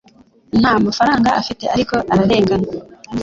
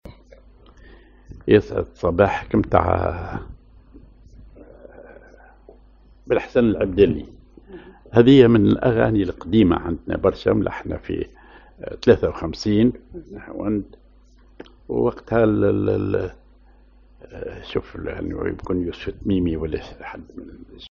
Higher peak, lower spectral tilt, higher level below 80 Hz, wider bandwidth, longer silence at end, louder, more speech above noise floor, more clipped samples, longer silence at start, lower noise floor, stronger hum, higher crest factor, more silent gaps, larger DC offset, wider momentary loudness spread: about the same, -2 dBFS vs 0 dBFS; about the same, -6 dB/octave vs -6.5 dB/octave; about the same, -42 dBFS vs -40 dBFS; about the same, 7.8 kHz vs 7.2 kHz; about the same, 0 s vs 0.05 s; first, -16 LUFS vs -20 LUFS; about the same, 34 dB vs 31 dB; neither; first, 0.55 s vs 0.05 s; about the same, -49 dBFS vs -51 dBFS; neither; second, 14 dB vs 22 dB; neither; neither; second, 9 LU vs 19 LU